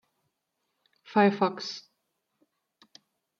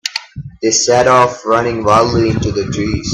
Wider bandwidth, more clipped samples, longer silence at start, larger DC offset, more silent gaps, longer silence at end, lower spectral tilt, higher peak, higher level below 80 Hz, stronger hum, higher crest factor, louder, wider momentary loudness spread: second, 7.2 kHz vs 12.5 kHz; neither; first, 1.1 s vs 0.05 s; neither; neither; first, 1.6 s vs 0 s; first, -6 dB/octave vs -4 dB/octave; second, -10 dBFS vs 0 dBFS; second, -84 dBFS vs -36 dBFS; neither; first, 22 dB vs 14 dB; second, -27 LUFS vs -13 LUFS; first, 15 LU vs 10 LU